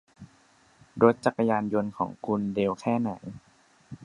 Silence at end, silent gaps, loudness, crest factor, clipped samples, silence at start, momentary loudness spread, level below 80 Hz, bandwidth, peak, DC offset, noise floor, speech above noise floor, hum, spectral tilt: 0 s; none; -27 LUFS; 24 dB; under 0.1%; 0.2 s; 19 LU; -62 dBFS; 10.5 kHz; -4 dBFS; under 0.1%; -61 dBFS; 35 dB; none; -7.5 dB/octave